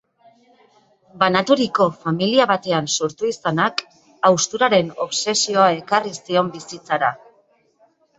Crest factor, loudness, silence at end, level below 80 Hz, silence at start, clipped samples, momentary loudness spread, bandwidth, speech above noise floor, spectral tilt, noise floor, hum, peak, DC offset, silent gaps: 18 dB; -19 LUFS; 1 s; -64 dBFS; 1.15 s; under 0.1%; 7 LU; 8.2 kHz; 40 dB; -3.5 dB/octave; -59 dBFS; none; -2 dBFS; under 0.1%; none